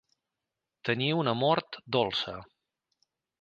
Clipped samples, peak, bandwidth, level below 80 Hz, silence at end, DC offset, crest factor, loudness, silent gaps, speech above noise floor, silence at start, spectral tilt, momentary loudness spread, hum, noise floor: under 0.1%; -12 dBFS; 8.8 kHz; -68 dBFS; 0.95 s; under 0.1%; 22 dB; -29 LUFS; none; 59 dB; 0.85 s; -6.5 dB/octave; 10 LU; none; -88 dBFS